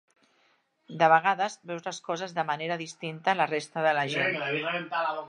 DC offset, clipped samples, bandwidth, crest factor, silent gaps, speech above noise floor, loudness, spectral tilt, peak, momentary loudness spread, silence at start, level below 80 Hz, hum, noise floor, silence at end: under 0.1%; under 0.1%; 10.5 kHz; 22 dB; none; 41 dB; -28 LUFS; -4 dB/octave; -6 dBFS; 13 LU; 0.9 s; -84 dBFS; none; -69 dBFS; 0 s